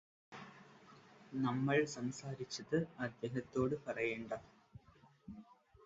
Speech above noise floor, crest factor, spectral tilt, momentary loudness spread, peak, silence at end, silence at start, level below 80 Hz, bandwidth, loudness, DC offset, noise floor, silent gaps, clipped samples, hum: 28 dB; 20 dB; -5.5 dB/octave; 25 LU; -22 dBFS; 0.35 s; 0.3 s; -72 dBFS; 7.6 kHz; -40 LUFS; under 0.1%; -67 dBFS; none; under 0.1%; none